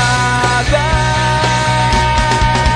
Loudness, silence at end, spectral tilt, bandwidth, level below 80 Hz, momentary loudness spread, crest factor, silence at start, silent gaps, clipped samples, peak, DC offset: -13 LUFS; 0 s; -4 dB/octave; 10.5 kHz; -22 dBFS; 1 LU; 12 dB; 0 s; none; under 0.1%; -2 dBFS; under 0.1%